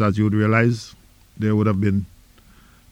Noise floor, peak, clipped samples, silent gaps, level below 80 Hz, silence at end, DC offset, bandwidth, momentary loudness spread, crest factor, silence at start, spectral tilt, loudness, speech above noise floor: -50 dBFS; -6 dBFS; under 0.1%; none; -50 dBFS; 0.85 s; under 0.1%; 9.4 kHz; 14 LU; 16 dB; 0 s; -8 dB/octave; -20 LUFS; 32 dB